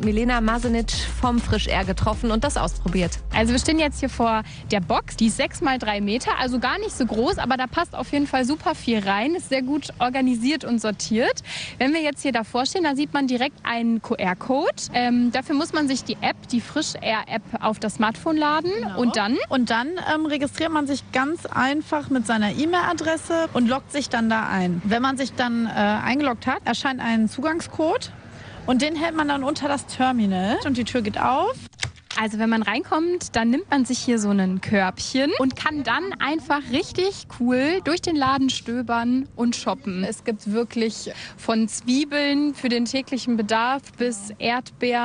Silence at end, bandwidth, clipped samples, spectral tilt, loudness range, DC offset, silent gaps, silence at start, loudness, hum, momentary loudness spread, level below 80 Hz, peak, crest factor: 0 s; 10 kHz; under 0.1%; -4.5 dB/octave; 1 LU; under 0.1%; none; 0 s; -23 LUFS; none; 5 LU; -40 dBFS; -6 dBFS; 18 dB